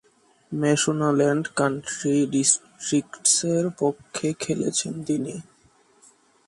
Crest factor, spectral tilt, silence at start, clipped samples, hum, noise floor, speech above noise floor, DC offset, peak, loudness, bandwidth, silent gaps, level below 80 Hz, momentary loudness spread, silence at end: 20 dB; -4 dB/octave; 0.5 s; under 0.1%; none; -59 dBFS; 36 dB; under 0.1%; -4 dBFS; -23 LUFS; 11.5 kHz; none; -66 dBFS; 8 LU; 1.05 s